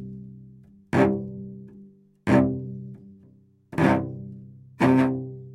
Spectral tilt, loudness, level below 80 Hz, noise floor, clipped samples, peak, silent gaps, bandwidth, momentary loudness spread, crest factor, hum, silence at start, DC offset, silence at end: -8 dB/octave; -24 LUFS; -56 dBFS; -56 dBFS; under 0.1%; -6 dBFS; none; 11.5 kHz; 21 LU; 20 dB; none; 0 s; under 0.1%; 0 s